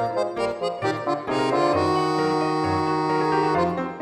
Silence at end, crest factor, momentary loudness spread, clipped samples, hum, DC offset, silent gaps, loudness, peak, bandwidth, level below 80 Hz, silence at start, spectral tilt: 0 s; 14 dB; 5 LU; under 0.1%; none; under 0.1%; none; -23 LUFS; -8 dBFS; 12 kHz; -56 dBFS; 0 s; -6 dB/octave